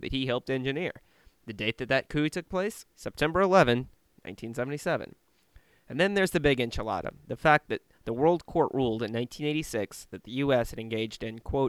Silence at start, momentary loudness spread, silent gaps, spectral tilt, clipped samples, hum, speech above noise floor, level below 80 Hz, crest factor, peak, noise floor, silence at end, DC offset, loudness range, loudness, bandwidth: 0 s; 14 LU; none; -5.5 dB/octave; under 0.1%; none; 32 dB; -50 dBFS; 24 dB; -4 dBFS; -60 dBFS; 0 s; under 0.1%; 3 LU; -29 LUFS; 15 kHz